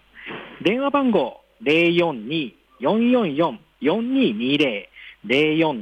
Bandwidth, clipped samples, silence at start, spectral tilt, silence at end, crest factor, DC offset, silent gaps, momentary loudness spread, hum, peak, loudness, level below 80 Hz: 8.8 kHz; under 0.1%; 0.15 s; -7 dB/octave; 0 s; 14 dB; under 0.1%; none; 15 LU; none; -8 dBFS; -21 LUFS; -64 dBFS